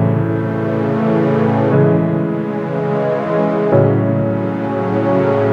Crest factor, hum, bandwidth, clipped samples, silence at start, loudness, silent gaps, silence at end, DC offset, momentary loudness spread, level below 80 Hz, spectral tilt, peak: 14 dB; none; 6.2 kHz; under 0.1%; 0 s; -16 LUFS; none; 0 s; under 0.1%; 6 LU; -50 dBFS; -10 dB/octave; 0 dBFS